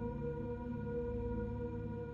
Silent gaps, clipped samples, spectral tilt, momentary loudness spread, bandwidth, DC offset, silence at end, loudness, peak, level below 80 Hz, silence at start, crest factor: none; under 0.1%; -11 dB/octave; 2 LU; 5.4 kHz; under 0.1%; 0 s; -41 LUFS; -30 dBFS; -48 dBFS; 0 s; 10 dB